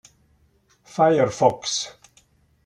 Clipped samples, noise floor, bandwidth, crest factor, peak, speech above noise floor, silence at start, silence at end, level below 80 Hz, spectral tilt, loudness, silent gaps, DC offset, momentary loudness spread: under 0.1%; -62 dBFS; 11.5 kHz; 22 dB; -2 dBFS; 42 dB; 0.95 s; 0.75 s; -62 dBFS; -4 dB/octave; -21 LUFS; none; under 0.1%; 15 LU